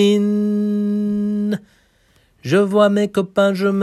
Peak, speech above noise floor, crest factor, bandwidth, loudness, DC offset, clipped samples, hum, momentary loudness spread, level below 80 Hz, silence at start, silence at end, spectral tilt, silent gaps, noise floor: -2 dBFS; 41 dB; 14 dB; 12.5 kHz; -18 LUFS; under 0.1%; under 0.1%; none; 7 LU; -58 dBFS; 0 s; 0 s; -7 dB/octave; none; -57 dBFS